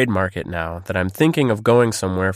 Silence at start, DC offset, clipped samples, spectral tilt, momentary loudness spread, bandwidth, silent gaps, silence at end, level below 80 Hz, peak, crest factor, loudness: 0 s; under 0.1%; under 0.1%; -6 dB/octave; 10 LU; 15.5 kHz; none; 0 s; -46 dBFS; -4 dBFS; 16 dB; -19 LUFS